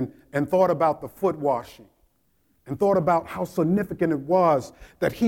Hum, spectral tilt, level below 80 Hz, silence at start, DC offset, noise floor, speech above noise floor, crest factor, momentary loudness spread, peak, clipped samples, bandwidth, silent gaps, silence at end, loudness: none; -7.5 dB/octave; -56 dBFS; 0 s; under 0.1%; -68 dBFS; 45 dB; 16 dB; 9 LU; -8 dBFS; under 0.1%; 17 kHz; none; 0 s; -23 LUFS